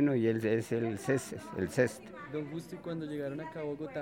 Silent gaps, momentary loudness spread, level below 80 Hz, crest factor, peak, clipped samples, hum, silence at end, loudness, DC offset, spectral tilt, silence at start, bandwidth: none; 11 LU; -68 dBFS; 20 dB; -14 dBFS; under 0.1%; none; 0 s; -35 LUFS; under 0.1%; -6.5 dB/octave; 0 s; 16.5 kHz